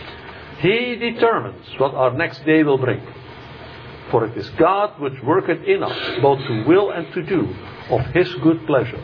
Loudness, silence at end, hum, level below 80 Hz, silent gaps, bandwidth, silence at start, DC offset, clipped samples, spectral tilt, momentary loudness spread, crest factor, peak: -19 LUFS; 0 s; none; -50 dBFS; none; 5.4 kHz; 0 s; under 0.1%; under 0.1%; -8.5 dB/octave; 19 LU; 16 dB; -4 dBFS